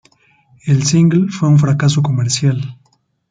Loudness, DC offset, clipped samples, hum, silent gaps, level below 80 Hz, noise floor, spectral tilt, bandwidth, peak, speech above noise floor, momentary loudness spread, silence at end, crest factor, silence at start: -14 LUFS; under 0.1%; under 0.1%; none; none; -52 dBFS; -58 dBFS; -5.5 dB/octave; 9.4 kHz; -2 dBFS; 46 dB; 10 LU; 0.55 s; 12 dB; 0.65 s